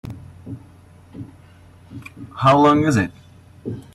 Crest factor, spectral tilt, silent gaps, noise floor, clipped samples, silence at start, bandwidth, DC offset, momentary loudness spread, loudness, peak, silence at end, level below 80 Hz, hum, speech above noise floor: 18 dB; -6.5 dB/octave; none; -46 dBFS; under 0.1%; 0.05 s; 12.5 kHz; under 0.1%; 25 LU; -16 LUFS; -4 dBFS; 0.15 s; -52 dBFS; none; 30 dB